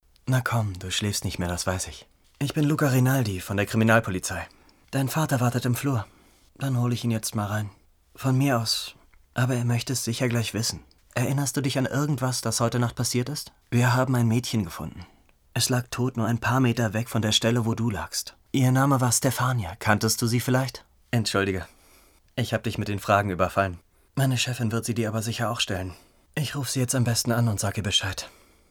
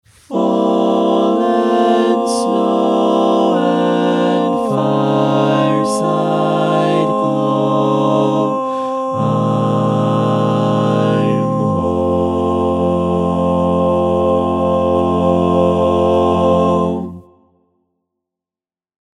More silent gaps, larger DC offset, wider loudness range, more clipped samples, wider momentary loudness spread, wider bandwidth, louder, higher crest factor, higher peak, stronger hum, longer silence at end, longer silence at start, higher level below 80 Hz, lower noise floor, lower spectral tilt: neither; neither; about the same, 3 LU vs 2 LU; neither; first, 11 LU vs 3 LU; first, 18.5 kHz vs 12 kHz; second, -25 LUFS vs -15 LUFS; first, 22 dB vs 14 dB; second, -4 dBFS vs 0 dBFS; neither; second, 0.4 s vs 1.95 s; about the same, 0.25 s vs 0.3 s; second, -52 dBFS vs -44 dBFS; second, -57 dBFS vs under -90 dBFS; second, -4.5 dB/octave vs -7.5 dB/octave